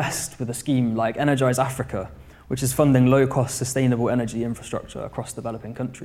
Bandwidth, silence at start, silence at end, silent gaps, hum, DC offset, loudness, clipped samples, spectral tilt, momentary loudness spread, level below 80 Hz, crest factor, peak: 16 kHz; 0 s; 0 s; none; none; under 0.1%; -23 LUFS; under 0.1%; -6 dB/octave; 14 LU; -48 dBFS; 18 dB; -4 dBFS